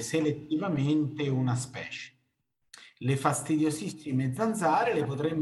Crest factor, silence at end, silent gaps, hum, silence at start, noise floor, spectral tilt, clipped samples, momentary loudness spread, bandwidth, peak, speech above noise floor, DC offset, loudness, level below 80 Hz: 20 dB; 0 s; none; none; 0 s; -77 dBFS; -6 dB/octave; under 0.1%; 10 LU; 12.5 kHz; -10 dBFS; 48 dB; under 0.1%; -29 LUFS; -68 dBFS